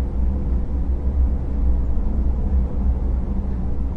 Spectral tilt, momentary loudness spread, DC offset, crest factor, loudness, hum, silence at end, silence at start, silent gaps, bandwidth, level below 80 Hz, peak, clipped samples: -11 dB/octave; 3 LU; under 0.1%; 12 dB; -24 LUFS; none; 0 s; 0 s; none; 2.4 kHz; -20 dBFS; -8 dBFS; under 0.1%